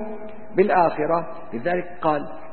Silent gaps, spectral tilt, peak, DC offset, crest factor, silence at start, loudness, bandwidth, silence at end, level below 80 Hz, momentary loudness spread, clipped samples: none; -11 dB/octave; -6 dBFS; 2%; 18 dB; 0 s; -22 LUFS; 4.4 kHz; 0 s; -56 dBFS; 15 LU; under 0.1%